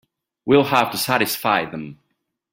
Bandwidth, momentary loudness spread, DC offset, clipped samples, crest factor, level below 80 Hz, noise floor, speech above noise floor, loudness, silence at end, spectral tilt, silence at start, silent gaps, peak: 16.5 kHz; 17 LU; under 0.1%; under 0.1%; 20 dB; -60 dBFS; -74 dBFS; 55 dB; -18 LUFS; 0.6 s; -4 dB/octave; 0.45 s; none; -2 dBFS